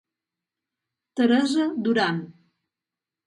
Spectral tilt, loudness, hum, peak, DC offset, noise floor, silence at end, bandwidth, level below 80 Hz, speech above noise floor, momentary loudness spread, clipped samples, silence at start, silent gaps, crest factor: -5.5 dB/octave; -23 LUFS; none; -8 dBFS; under 0.1%; -89 dBFS; 0.95 s; 11.5 kHz; -74 dBFS; 67 dB; 10 LU; under 0.1%; 1.15 s; none; 18 dB